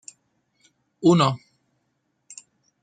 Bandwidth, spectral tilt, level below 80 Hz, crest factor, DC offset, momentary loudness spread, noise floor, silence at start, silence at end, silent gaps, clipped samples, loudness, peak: 9.4 kHz; -6 dB/octave; -66 dBFS; 20 dB; under 0.1%; 26 LU; -73 dBFS; 1 s; 1.45 s; none; under 0.1%; -20 LUFS; -6 dBFS